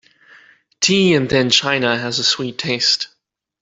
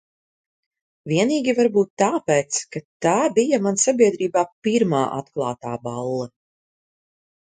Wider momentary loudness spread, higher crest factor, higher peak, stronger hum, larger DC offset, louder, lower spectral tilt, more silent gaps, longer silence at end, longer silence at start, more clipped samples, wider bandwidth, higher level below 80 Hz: second, 6 LU vs 10 LU; about the same, 18 dB vs 18 dB; about the same, -2 dBFS vs -4 dBFS; neither; neither; first, -16 LUFS vs -21 LUFS; second, -3 dB/octave vs -4.5 dB/octave; second, none vs 1.90-1.97 s, 2.85-3.00 s, 4.52-4.62 s; second, 0.55 s vs 1.2 s; second, 0.8 s vs 1.05 s; neither; second, 8.2 kHz vs 9.6 kHz; first, -52 dBFS vs -66 dBFS